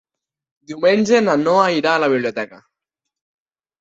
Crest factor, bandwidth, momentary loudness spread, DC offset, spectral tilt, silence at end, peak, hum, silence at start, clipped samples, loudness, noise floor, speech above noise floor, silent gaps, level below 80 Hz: 16 dB; 8 kHz; 13 LU; under 0.1%; -5 dB/octave; 1.25 s; -2 dBFS; none; 0.7 s; under 0.1%; -16 LUFS; -82 dBFS; 66 dB; none; -64 dBFS